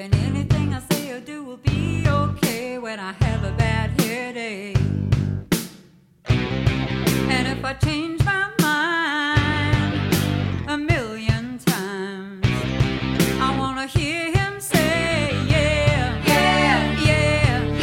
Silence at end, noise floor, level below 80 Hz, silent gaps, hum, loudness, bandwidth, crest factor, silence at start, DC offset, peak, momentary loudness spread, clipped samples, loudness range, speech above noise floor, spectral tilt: 0 s; -50 dBFS; -34 dBFS; none; none; -21 LUFS; 16.5 kHz; 18 dB; 0 s; under 0.1%; -2 dBFS; 7 LU; under 0.1%; 4 LU; 29 dB; -5.5 dB/octave